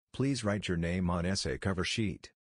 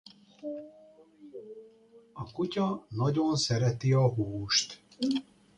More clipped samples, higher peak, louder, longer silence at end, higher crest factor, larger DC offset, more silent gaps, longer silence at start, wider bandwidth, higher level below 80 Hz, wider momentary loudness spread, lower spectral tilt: neither; second, -16 dBFS vs -12 dBFS; second, -33 LUFS vs -29 LUFS; about the same, 0.25 s vs 0.35 s; about the same, 16 dB vs 18 dB; neither; neither; second, 0.15 s vs 0.4 s; about the same, 10.5 kHz vs 10.5 kHz; first, -50 dBFS vs -62 dBFS; second, 3 LU vs 21 LU; about the same, -5 dB/octave vs -5 dB/octave